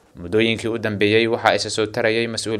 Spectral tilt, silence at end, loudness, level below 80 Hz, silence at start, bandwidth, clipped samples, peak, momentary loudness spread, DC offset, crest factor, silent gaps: -4.5 dB/octave; 0 s; -19 LUFS; -54 dBFS; 0.15 s; 13.5 kHz; under 0.1%; 0 dBFS; 6 LU; under 0.1%; 20 dB; none